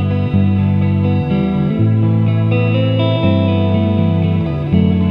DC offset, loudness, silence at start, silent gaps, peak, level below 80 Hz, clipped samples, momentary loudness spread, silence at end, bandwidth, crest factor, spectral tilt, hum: under 0.1%; -14 LUFS; 0 s; none; -2 dBFS; -38 dBFS; under 0.1%; 2 LU; 0 s; 5.2 kHz; 12 dB; -10.5 dB/octave; none